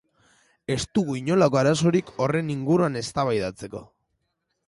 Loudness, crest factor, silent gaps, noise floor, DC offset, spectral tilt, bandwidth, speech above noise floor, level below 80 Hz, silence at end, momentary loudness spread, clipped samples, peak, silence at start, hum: -23 LUFS; 16 dB; none; -77 dBFS; under 0.1%; -6 dB/octave; 11.5 kHz; 54 dB; -54 dBFS; 0.85 s; 15 LU; under 0.1%; -8 dBFS; 0.7 s; none